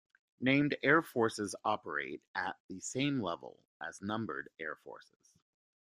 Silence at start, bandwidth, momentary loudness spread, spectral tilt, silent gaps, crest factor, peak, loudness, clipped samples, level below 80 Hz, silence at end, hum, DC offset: 0.4 s; 15 kHz; 17 LU; -5 dB/octave; 2.27-2.34 s, 2.60-2.69 s, 3.67-3.80 s; 24 dB; -12 dBFS; -35 LUFS; under 0.1%; -76 dBFS; 1 s; none; under 0.1%